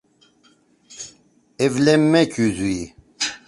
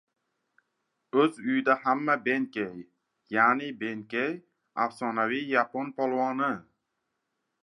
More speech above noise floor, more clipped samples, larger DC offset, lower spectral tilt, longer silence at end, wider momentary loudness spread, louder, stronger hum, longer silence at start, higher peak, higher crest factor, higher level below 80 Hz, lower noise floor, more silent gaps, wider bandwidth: second, 40 dB vs 54 dB; neither; neither; about the same, -5 dB/octave vs -6 dB/octave; second, 0.1 s vs 1 s; first, 21 LU vs 11 LU; first, -19 LUFS vs -28 LUFS; neither; second, 0.9 s vs 1.15 s; first, -2 dBFS vs -8 dBFS; about the same, 18 dB vs 22 dB; first, -52 dBFS vs -80 dBFS; second, -58 dBFS vs -81 dBFS; neither; about the same, 11.5 kHz vs 11 kHz